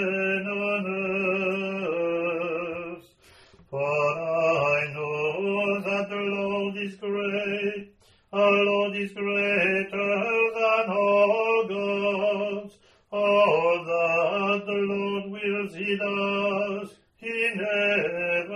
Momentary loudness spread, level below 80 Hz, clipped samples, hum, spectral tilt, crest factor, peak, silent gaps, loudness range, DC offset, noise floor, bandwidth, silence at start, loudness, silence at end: 10 LU; -68 dBFS; under 0.1%; none; -6 dB/octave; 18 dB; -8 dBFS; none; 5 LU; under 0.1%; -55 dBFS; 11 kHz; 0 s; -25 LUFS; 0 s